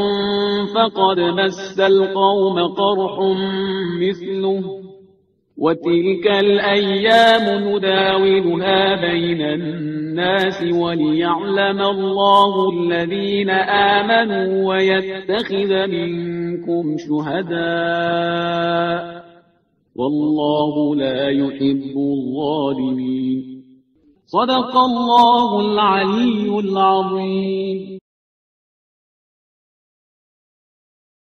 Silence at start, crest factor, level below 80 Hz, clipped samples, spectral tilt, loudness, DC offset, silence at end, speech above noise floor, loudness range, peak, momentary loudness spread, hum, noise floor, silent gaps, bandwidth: 0 s; 18 dB; -58 dBFS; under 0.1%; -6.5 dB/octave; -17 LUFS; under 0.1%; 3.2 s; 43 dB; 6 LU; 0 dBFS; 8 LU; none; -60 dBFS; none; 8.6 kHz